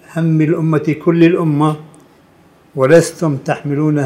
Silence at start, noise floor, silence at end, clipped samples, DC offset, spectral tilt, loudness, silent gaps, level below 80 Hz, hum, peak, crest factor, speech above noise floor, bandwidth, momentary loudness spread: 0.1 s; -48 dBFS; 0 s; under 0.1%; under 0.1%; -7.5 dB/octave; -14 LUFS; none; -58 dBFS; none; 0 dBFS; 14 dB; 35 dB; 13.5 kHz; 8 LU